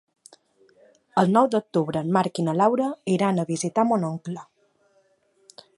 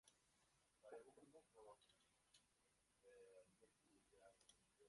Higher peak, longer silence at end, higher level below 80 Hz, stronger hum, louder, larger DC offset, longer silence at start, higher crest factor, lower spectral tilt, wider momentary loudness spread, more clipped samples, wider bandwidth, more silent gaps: first, -4 dBFS vs -48 dBFS; first, 1.35 s vs 0 s; first, -70 dBFS vs under -90 dBFS; neither; first, -23 LUFS vs -67 LUFS; neither; first, 1.15 s vs 0.05 s; about the same, 20 dB vs 22 dB; first, -6.5 dB/octave vs -3 dB/octave; first, 9 LU vs 5 LU; neither; about the same, 11.5 kHz vs 11.5 kHz; neither